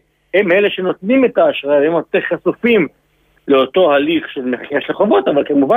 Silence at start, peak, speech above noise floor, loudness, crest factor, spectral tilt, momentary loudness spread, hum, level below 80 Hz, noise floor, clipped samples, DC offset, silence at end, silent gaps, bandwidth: 0.35 s; -2 dBFS; 36 dB; -14 LUFS; 12 dB; -8 dB/octave; 7 LU; none; -56 dBFS; -50 dBFS; under 0.1%; under 0.1%; 0 s; none; 14 kHz